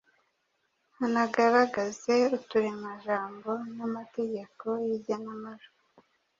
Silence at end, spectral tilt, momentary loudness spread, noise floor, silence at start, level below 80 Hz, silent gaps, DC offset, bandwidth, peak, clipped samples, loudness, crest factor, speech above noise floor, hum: 0.75 s; -5 dB/octave; 12 LU; -76 dBFS; 1 s; -76 dBFS; none; under 0.1%; 7.6 kHz; -10 dBFS; under 0.1%; -29 LUFS; 20 dB; 47 dB; none